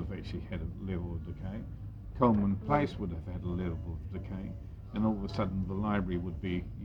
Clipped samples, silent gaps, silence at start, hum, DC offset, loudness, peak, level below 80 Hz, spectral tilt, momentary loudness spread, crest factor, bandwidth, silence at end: under 0.1%; none; 0 s; none; under 0.1%; -34 LUFS; -12 dBFS; -46 dBFS; -9 dB/octave; 11 LU; 22 dB; 7 kHz; 0 s